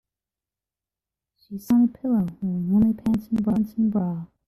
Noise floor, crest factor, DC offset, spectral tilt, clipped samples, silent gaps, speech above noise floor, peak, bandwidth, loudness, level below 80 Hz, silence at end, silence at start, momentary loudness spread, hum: under -90 dBFS; 12 dB; under 0.1%; -9.5 dB/octave; under 0.1%; none; over 68 dB; -12 dBFS; 13.5 kHz; -23 LUFS; -52 dBFS; 0.2 s; 1.5 s; 8 LU; none